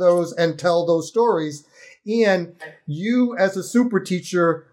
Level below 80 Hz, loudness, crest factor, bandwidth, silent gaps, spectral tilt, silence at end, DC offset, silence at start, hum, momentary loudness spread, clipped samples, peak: -76 dBFS; -20 LUFS; 14 dB; 15.5 kHz; none; -6 dB/octave; 0.15 s; under 0.1%; 0 s; none; 13 LU; under 0.1%; -6 dBFS